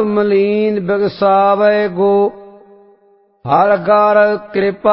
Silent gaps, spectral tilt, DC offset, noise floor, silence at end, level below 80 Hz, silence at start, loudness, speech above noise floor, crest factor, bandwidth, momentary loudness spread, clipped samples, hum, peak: none; -11.5 dB/octave; under 0.1%; -52 dBFS; 0 s; -56 dBFS; 0 s; -13 LUFS; 40 dB; 14 dB; 5.8 kHz; 6 LU; under 0.1%; none; 0 dBFS